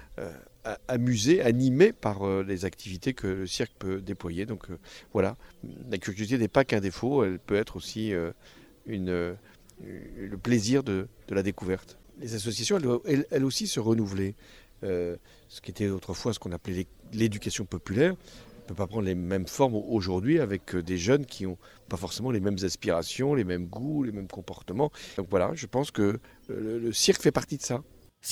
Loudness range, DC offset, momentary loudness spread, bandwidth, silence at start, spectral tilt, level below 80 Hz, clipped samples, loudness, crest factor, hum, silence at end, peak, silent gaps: 6 LU; under 0.1%; 16 LU; 16.5 kHz; 0 s; -5 dB/octave; -54 dBFS; under 0.1%; -29 LUFS; 22 dB; none; 0 s; -8 dBFS; none